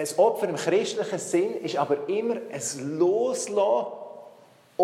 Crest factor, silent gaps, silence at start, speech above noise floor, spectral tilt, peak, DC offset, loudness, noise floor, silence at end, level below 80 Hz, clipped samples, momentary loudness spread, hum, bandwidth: 18 dB; none; 0 s; 29 dB; -4 dB/octave; -8 dBFS; under 0.1%; -26 LUFS; -54 dBFS; 0 s; -84 dBFS; under 0.1%; 12 LU; none; 14.5 kHz